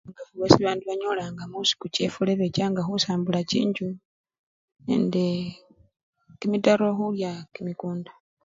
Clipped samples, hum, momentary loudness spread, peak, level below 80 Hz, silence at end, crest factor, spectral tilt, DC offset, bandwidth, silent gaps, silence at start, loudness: under 0.1%; none; 14 LU; 0 dBFS; -58 dBFS; 0.35 s; 26 dB; -5.5 dB/octave; under 0.1%; 7.8 kHz; 4.05-4.24 s, 4.39-4.68 s, 6.03-6.13 s; 0.05 s; -25 LUFS